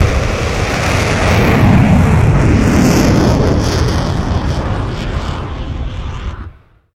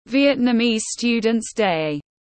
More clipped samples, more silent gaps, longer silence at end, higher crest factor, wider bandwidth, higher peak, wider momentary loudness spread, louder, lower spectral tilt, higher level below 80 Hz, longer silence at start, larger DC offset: neither; neither; first, 0.45 s vs 0.2 s; about the same, 12 dB vs 14 dB; first, 16 kHz vs 8.8 kHz; first, 0 dBFS vs -6 dBFS; first, 13 LU vs 5 LU; first, -13 LUFS vs -20 LUFS; first, -6 dB/octave vs -4 dB/octave; first, -20 dBFS vs -56 dBFS; about the same, 0 s vs 0.1 s; neither